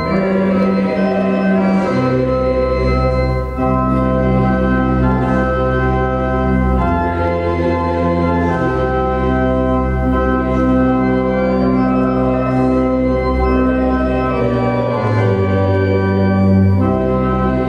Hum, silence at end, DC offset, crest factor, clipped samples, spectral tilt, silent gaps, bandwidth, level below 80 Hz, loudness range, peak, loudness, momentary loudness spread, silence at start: none; 0 s; under 0.1%; 12 dB; under 0.1%; -9.5 dB/octave; none; 6.8 kHz; -24 dBFS; 1 LU; -2 dBFS; -15 LUFS; 2 LU; 0 s